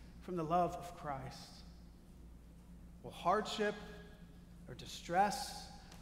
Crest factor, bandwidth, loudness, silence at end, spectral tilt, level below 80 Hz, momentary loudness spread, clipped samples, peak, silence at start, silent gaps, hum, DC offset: 20 dB; 16 kHz; -39 LUFS; 0 s; -4.5 dB/octave; -58 dBFS; 24 LU; under 0.1%; -20 dBFS; 0 s; none; none; under 0.1%